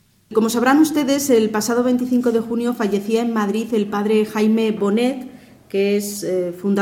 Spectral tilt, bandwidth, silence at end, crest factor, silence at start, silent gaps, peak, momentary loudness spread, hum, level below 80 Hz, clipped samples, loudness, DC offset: -5 dB/octave; 17 kHz; 0 s; 14 dB; 0.3 s; none; -4 dBFS; 7 LU; none; -60 dBFS; under 0.1%; -19 LUFS; under 0.1%